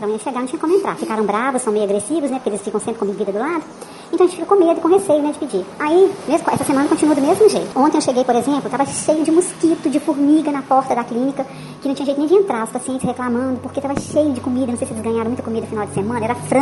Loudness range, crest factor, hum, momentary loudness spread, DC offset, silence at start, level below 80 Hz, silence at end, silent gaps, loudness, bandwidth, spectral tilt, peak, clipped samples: 5 LU; 16 dB; none; 9 LU; under 0.1%; 0 s; -56 dBFS; 0 s; none; -18 LUFS; 11.5 kHz; -5 dB/octave; -2 dBFS; under 0.1%